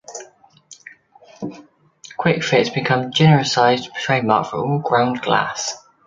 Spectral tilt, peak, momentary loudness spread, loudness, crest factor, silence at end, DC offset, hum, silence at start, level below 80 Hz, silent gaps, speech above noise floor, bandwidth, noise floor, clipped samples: -5 dB/octave; 0 dBFS; 18 LU; -18 LUFS; 20 dB; 0.3 s; under 0.1%; none; 0.1 s; -58 dBFS; none; 31 dB; 7.6 kHz; -48 dBFS; under 0.1%